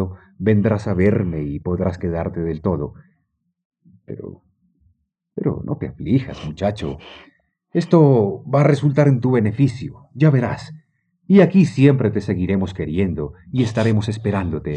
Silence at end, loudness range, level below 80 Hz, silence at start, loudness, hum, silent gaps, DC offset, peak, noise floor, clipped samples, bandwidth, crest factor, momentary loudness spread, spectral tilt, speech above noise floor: 0 s; 11 LU; -48 dBFS; 0 s; -19 LUFS; none; 3.65-3.70 s; under 0.1%; -2 dBFS; -70 dBFS; under 0.1%; 8.8 kHz; 18 dB; 16 LU; -8.5 dB/octave; 52 dB